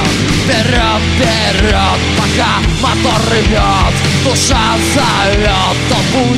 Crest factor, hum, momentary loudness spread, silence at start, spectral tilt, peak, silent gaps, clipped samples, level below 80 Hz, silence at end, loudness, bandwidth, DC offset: 10 dB; none; 2 LU; 0 s; -4 dB/octave; 0 dBFS; none; under 0.1%; -20 dBFS; 0 s; -11 LUFS; 15 kHz; under 0.1%